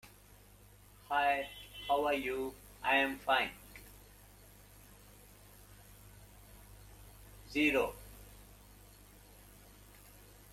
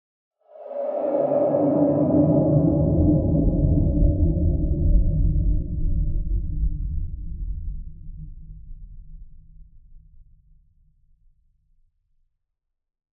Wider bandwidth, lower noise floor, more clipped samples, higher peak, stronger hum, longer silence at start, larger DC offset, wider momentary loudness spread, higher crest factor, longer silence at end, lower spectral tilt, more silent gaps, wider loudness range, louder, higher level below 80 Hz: first, 16.5 kHz vs 2.3 kHz; second, -60 dBFS vs -79 dBFS; neither; second, -16 dBFS vs -6 dBFS; first, 50 Hz at -60 dBFS vs none; second, 0.05 s vs 0.55 s; neither; first, 27 LU vs 16 LU; first, 22 dB vs 16 dB; second, 0.7 s vs 2.9 s; second, -3.5 dB/octave vs -14.5 dB/octave; neither; first, 23 LU vs 18 LU; second, -34 LUFS vs -22 LUFS; second, -60 dBFS vs -28 dBFS